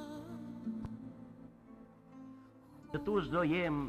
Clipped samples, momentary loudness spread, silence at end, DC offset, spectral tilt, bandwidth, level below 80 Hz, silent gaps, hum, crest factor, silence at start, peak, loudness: under 0.1%; 24 LU; 0 s; under 0.1%; -7.5 dB/octave; 13.5 kHz; -60 dBFS; none; none; 18 dB; 0 s; -20 dBFS; -38 LUFS